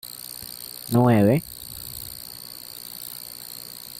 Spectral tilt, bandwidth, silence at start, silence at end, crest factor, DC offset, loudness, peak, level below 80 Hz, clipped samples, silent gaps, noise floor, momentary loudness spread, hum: -6 dB/octave; 17 kHz; 0.05 s; 0 s; 18 dB; under 0.1%; -25 LUFS; -8 dBFS; -56 dBFS; under 0.1%; none; -39 dBFS; 17 LU; none